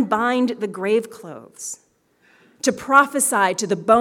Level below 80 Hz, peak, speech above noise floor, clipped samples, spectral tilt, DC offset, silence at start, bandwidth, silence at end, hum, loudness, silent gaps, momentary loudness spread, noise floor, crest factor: -66 dBFS; -2 dBFS; 40 dB; under 0.1%; -3 dB/octave; under 0.1%; 0 s; 18 kHz; 0 s; none; -19 LUFS; none; 20 LU; -60 dBFS; 20 dB